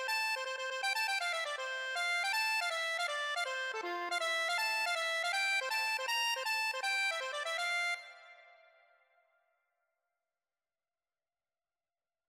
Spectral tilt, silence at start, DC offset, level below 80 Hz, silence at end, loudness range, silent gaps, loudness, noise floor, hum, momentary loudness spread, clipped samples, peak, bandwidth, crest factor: 2.5 dB/octave; 0 s; under 0.1%; under -90 dBFS; 3.85 s; 7 LU; none; -34 LUFS; under -90 dBFS; none; 5 LU; under 0.1%; -24 dBFS; 16 kHz; 14 dB